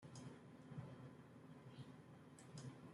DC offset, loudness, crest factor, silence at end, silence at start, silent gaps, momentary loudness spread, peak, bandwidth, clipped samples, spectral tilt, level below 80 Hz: under 0.1%; -59 LUFS; 18 dB; 0 s; 0 s; none; 6 LU; -40 dBFS; 13 kHz; under 0.1%; -6 dB/octave; -84 dBFS